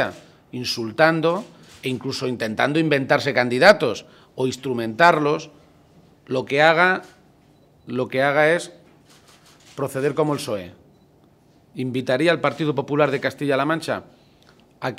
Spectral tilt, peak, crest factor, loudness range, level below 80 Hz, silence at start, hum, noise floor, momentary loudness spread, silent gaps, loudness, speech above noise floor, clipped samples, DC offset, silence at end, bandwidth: -5 dB/octave; 0 dBFS; 22 dB; 6 LU; -64 dBFS; 0 s; none; -55 dBFS; 15 LU; none; -21 LUFS; 35 dB; under 0.1%; under 0.1%; 0.05 s; 16 kHz